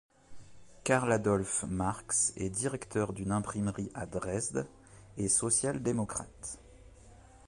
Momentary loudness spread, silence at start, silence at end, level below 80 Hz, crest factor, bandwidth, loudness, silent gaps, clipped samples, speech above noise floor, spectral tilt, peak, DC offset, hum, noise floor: 12 LU; 0.3 s; 0.1 s; -56 dBFS; 20 dB; 11.5 kHz; -32 LUFS; none; under 0.1%; 23 dB; -4.5 dB/octave; -14 dBFS; under 0.1%; none; -56 dBFS